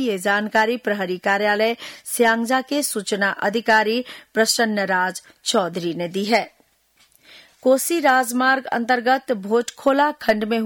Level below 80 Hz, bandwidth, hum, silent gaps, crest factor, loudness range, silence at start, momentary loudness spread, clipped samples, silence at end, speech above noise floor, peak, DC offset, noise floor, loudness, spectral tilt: -66 dBFS; 19.5 kHz; none; none; 16 dB; 3 LU; 0 s; 8 LU; under 0.1%; 0 s; 40 dB; -6 dBFS; under 0.1%; -60 dBFS; -20 LUFS; -3 dB/octave